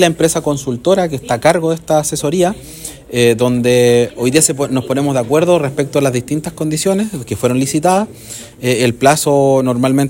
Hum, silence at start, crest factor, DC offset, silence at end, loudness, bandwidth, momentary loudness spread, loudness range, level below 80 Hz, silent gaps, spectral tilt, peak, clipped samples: none; 0 s; 14 dB; under 0.1%; 0 s; -14 LUFS; 17 kHz; 8 LU; 2 LU; -46 dBFS; none; -5 dB/octave; 0 dBFS; 0.1%